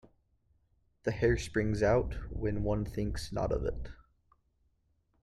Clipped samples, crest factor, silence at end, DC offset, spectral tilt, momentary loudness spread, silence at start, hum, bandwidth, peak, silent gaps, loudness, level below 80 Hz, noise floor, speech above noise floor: under 0.1%; 18 dB; 1.3 s; under 0.1%; -6.5 dB/octave; 10 LU; 1.05 s; none; 12.5 kHz; -16 dBFS; none; -33 LUFS; -44 dBFS; -74 dBFS; 42 dB